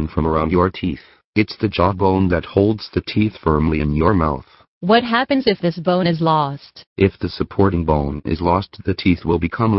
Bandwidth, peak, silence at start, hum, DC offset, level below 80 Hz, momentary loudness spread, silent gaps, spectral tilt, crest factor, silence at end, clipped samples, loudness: 5.8 kHz; 0 dBFS; 0 s; none; under 0.1%; -34 dBFS; 8 LU; 1.24-1.33 s, 4.68-4.81 s, 6.87-6.96 s; -11 dB/octave; 18 dB; 0 s; under 0.1%; -18 LUFS